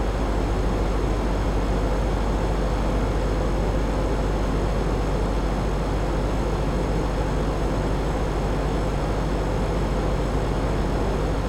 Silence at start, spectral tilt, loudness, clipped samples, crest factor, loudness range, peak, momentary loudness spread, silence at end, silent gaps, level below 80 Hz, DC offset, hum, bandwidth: 0 s; -7 dB/octave; -25 LUFS; under 0.1%; 12 dB; 0 LU; -10 dBFS; 1 LU; 0 s; none; -26 dBFS; under 0.1%; none; 11.5 kHz